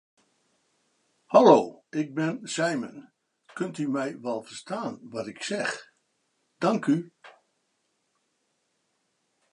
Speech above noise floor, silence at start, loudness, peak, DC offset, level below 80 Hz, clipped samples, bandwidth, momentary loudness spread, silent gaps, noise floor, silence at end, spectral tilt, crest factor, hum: 50 dB; 1.3 s; -26 LUFS; -2 dBFS; under 0.1%; -80 dBFS; under 0.1%; 11 kHz; 18 LU; none; -75 dBFS; 2.25 s; -5.5 dB/octave; 26 dB; none